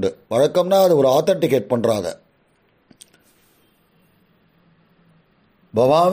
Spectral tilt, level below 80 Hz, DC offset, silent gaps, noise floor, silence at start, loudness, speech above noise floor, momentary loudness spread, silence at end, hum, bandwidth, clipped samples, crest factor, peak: -6 dB/octave; -62 dBFS; under 0.1%; none; -61 dBFS; 0 s; -18 LUFS; 44 dB; 9 LU; 0 s; none; 15.5 kHz; under 0.1%; 16 dB; -4 dBFS